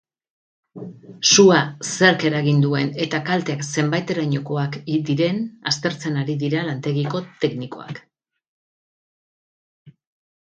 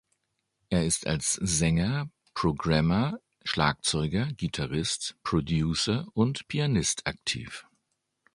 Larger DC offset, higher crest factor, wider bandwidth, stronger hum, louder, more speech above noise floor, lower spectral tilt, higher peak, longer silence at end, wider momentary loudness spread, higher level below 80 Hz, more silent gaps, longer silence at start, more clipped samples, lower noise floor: neither; about the same, 22 dB vs 22 dB; second, 9.2 kHz vs 11.5 kHz; neither; first, -20 LUFS vs -28 LUFS; first, over 70 dB vs 51 dB; about the same, -4.5 dB/octave vs -4.5 dB/octave; first, 0 dBFS vs -8 dBFS; about the same, 0.65 s vs 0.75 s; first, 17 LU vs 7 LU; second, -64 dBFS vs -46 dBFS; first, 8.48-9.86 s vs none; about the same, 0.75 s vs 0.7 s; neither; first, under -90 dBFS vs -79 dBFS